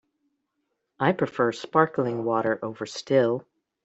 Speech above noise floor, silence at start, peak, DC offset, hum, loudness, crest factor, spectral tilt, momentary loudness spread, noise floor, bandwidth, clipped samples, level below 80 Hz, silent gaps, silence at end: 54 dB; 1 s; -4 dBFS; under 0.1%; none; -25 LUFS; 22 dB; -6 dB/octave; 9 LU; -78 dBFS; 8.2 kHz; under 0.1%; -68 dBFS; none; 0.45 s